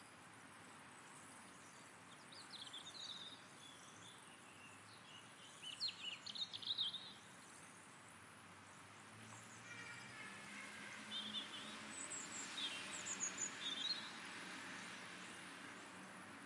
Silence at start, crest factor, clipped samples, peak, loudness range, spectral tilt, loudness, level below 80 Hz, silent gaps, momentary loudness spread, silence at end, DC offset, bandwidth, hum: 0 s; 20 dB; under 0.1%; -32 dBFS; 9 LU; -0.5 dB/octave; -49 LUFS; under -90 dBFS; none; 16 LU; 0 s; under 0.1%; 12 kHz; none